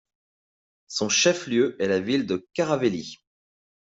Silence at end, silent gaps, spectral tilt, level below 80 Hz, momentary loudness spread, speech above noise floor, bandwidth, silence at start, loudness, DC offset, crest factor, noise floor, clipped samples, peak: 0.75 s; none; -3.5 dB/octave; -68 dBFS; 11 LU; over 66 dB; 8 kHz; 0.9 s; -24 LUFS; under 0.1%; 18 dB; under -90 dBFS; under 0.1%; -8 dBFS